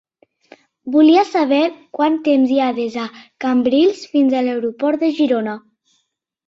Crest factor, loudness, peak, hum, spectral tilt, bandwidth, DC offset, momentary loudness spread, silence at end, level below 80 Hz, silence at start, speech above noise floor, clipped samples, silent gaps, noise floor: 14 dB; -16 LUFS; -2 dBFS; none; -5.5 dB/octave; 7.6 kHz; under 0.1%; 12 LU; 0.9 s; -64 dBFS; 0.85 s; 54 dB; under 0.1%; none; -70 dBFS